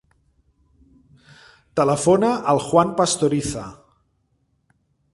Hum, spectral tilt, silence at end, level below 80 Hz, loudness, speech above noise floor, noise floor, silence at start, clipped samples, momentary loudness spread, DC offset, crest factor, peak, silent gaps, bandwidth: none; -5 dB/octave; 1.4 s; -52 dBFS; -19 LUFS; 48 dB; -67 dBFS; 1.75 s; under 0.1%; 12 LU; under 0.1%; 20 dB; -2 dBFS; none; 11.5 kHz